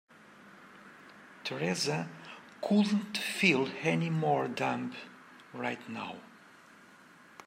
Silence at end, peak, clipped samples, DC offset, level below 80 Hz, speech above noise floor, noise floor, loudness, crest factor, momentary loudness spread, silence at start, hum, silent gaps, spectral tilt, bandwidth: 0.05 s; -12 dBFS; under 0.1%; under 0.1%; -80 dBFS; 26 dB; -57 dBFS; -32 LUFS; 22 dB; 25 LU; 0.3 s; none; none; -5 dB/octave; 16 kHz